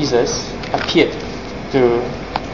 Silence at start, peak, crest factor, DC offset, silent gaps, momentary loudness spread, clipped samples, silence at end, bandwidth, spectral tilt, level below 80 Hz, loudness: 0 s; 0 dBFS; 18 dB; 0.8%; none; 11 LU; under 0.1%; 0 s; 7.4 kHz; -4.5 dB/octave; -38 dBFS; -18 LUFS